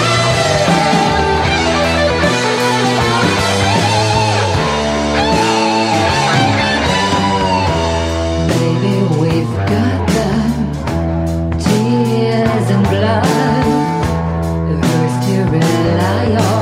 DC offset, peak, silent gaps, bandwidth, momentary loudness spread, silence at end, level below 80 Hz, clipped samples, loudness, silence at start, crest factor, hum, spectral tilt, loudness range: under 0.1%; 0 dBFS; none; 16 kHz; 4 LU; 0 s; -32 dBFS; under 0.1%; -13 LUFS; 0 s; 14 dB; none; -5.5 dB/octave; 2 LU